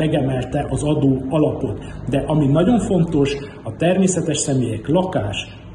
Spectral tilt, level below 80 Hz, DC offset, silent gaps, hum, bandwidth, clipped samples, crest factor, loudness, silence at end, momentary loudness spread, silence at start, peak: -6 dB/octave; -38 dBFS; under 0.1%; none; none; 10.5 kHz; under 0.1%; 14 dB; -19 LUFS; 0 s; 9 LU; 0 s; -4 dBFS